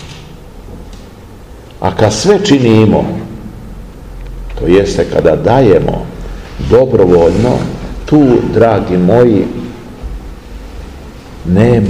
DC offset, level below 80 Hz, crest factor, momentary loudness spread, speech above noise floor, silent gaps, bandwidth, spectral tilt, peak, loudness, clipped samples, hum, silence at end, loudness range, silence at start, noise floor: 0.5%; -28 dBFS; 12 dB; 23 LU; 24 dB; none; 15 kHz; -7 dB/octave; 0 dBFS; -10 LUFS; 2%; none; 0 s; 3 LU; 0 s; -32 dBFS